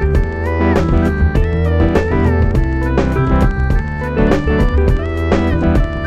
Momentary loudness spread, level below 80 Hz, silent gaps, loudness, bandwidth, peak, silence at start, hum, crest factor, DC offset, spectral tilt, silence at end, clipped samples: 3 LU; -18 dBFS; none; -15 LUFS; 8.2 kHz; 0 dBFS; 0 s; none; 12 dB; under 0.1%; -8.5 dB/octave; 0 s; under 0.1%